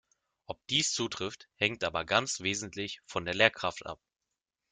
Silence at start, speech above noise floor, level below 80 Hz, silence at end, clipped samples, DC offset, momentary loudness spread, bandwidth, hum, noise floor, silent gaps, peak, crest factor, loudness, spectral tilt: 0.5 s; 55 dB; -66 dBFS; 0.75 s; under 0.1%; under 0.1%; 17 LU; 10 kHz; none; -87 dBFS; none; -6 dBFS; 28 dB; -31 LUFS; -2.5 dB/octave